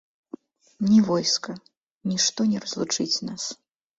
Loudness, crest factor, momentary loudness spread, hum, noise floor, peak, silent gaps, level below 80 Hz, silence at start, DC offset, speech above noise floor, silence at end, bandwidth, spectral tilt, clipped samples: -24 LUFS; 18 dB; 25 LU; none; -44 dBFS; -8 dBFS; 1.77-2.01 s; -66 dBFS; 0.8 s; under 0.1%; 21 dB; 0.45 s; 7.8 kHz; -3.5 dB/octave; under 0.1%